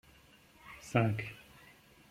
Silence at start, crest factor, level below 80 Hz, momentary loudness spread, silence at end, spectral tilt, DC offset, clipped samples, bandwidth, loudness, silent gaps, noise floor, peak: 0.65 s; 24 dB; -66 dBFS; 25 LU; 0.7 s; -7 dB/octave; under 0.1%; under 0.1%; 15.5 kHz; -34 LUFS; none; -62 dBFS; -14 dBFS